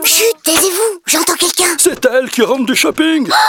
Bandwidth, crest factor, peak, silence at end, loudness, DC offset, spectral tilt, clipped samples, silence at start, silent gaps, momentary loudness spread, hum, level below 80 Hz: 18 kHz; 12 dB; 0 dBFS; 0 s; -11 LUFS; under 0.1%; -1 dB/octave; under 0.1%; 0 s; none; 3 LU; none; -52 dBFS